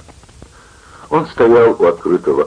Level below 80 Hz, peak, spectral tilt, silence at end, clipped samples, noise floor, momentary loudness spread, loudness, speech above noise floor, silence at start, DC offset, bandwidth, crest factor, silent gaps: -46 dBFS; 0 dBFS; -7.5 dB/octave; 0 s; under 0.1%; -42 dBFS; 9 LU; -13 LUFS; 30 dB; 1.1 s; under 0.1%; 10 kHz; 14 dB; none